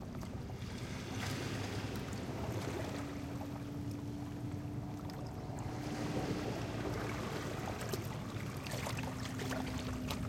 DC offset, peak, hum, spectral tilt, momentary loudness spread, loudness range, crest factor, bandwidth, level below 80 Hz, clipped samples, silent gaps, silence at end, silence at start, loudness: under 0.1%; -22 dBFS; none; -5.5 dB/octave; 5 LU; 2 LU; 20 dB; 16.5 kHz; -54 dBFS; under 0.1%; none; 0 s; 0 s; -41 LUFS